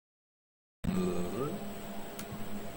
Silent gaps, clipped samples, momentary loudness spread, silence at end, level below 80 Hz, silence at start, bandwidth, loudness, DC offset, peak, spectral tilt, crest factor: none; under 0.1%; 9 LU; 0 s; -52 dBFS; 0.85 s; 17 kHz; -38 LUFS; under 0.1%; -18 dBFS; -6 dB/octave; 18 dB